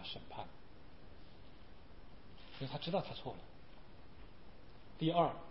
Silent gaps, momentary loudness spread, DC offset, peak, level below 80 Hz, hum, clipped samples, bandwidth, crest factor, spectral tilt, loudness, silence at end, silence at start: none; 25 LU; 0.3%; -20 dBFS; -62 dBFS; none; under 0.1%; 5.6 kHz; 24 dB; -5 dB/octave; -40 LUFS; 0 s; 0 s